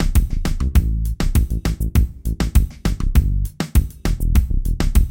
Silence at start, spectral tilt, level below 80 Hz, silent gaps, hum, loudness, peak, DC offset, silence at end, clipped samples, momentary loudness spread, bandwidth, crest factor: 0 s; -6 dB/octave; -18 dBFS; none; none; -21 LUFS; -2 dBFS; under 0.1%; 0 s; under 0.1%; 5 LU; 17 kHz; 16 dB